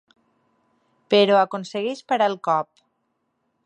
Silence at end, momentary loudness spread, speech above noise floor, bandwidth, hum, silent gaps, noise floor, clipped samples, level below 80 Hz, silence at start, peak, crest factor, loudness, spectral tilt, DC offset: 1 s; 11 LU; 53 dB; 10 kHz; none; none; -73 dBFS; under 0.1%; -78 dBFS; 1.1 s; -4 dBFS; 20 dB; -21 LUFS; -5 dB/octave; under 0.1%